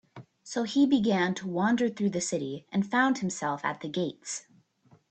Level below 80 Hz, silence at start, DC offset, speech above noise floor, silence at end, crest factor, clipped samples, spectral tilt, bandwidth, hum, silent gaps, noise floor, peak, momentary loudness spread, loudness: -70 dBFS; 0.15 s; under 0.1%; 35 dB; 0.7 s; 18 dB; under 0.1%; -4.5 dB/octave; 9 kHz; none; none; -63 dBFS; -12 dBFS; 11 LU; -29 LUFS